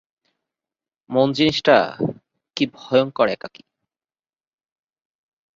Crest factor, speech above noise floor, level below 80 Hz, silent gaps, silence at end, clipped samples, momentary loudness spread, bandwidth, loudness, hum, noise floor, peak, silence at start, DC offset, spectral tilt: 20 dB; over 71 dB; -60 dBFS; none; 2.1 s; under 0.1%; 13 LU; 7.6 kHz; -19 LUFS; none; under -90 dBFS; -2 dBFS; 1.1 s; under 0.1%; -5.5 dB/octave